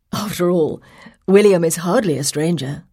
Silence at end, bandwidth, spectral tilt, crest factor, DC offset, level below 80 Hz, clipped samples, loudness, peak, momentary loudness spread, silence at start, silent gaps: 0.1 s; 16.5 kHz; -5 dB/octave; 16 dB; under 0.1%; -54 dBFS; under 0.1%; -17 LUFS; 0 dBFS; 12 LU; 0.15 s; none